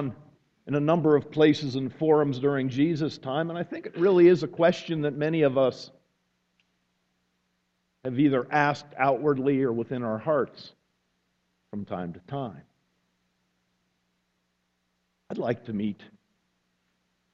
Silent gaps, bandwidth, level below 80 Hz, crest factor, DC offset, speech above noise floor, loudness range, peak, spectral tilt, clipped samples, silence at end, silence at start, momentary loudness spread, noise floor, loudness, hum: none; 7.6 kHz; -66 dBFS; 20 dB; under 0.1%; 50 dB; 16 LU; -6 dBFS; -7.5 dB/octave; under 0.1%; 1.4 s; 0 s; 14 LU; -75 dBFS; -26 LUFS; 60 Hz at -65 dBFS